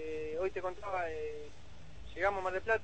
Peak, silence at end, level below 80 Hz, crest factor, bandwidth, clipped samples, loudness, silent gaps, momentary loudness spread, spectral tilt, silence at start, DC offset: -18 dBFS; 0 s; -56 dBFS; 18 dB; 8.4 kHz; under 0.1%; -37 LUFS; none; 20 LU; -5.5 dB/octave; 0 s; 0.5%